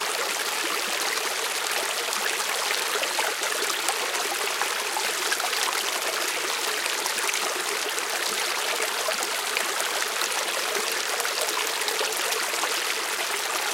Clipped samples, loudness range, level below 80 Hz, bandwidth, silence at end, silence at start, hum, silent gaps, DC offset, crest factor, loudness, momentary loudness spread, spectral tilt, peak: under 0.1%; 0 LU; -84 dBFS; 17 kHz; 0 s; 0 s; none; none; under 0.1%; 24 dB; -25 LUFS; 1 LU; 1.5 dB/octave; -4 dBFS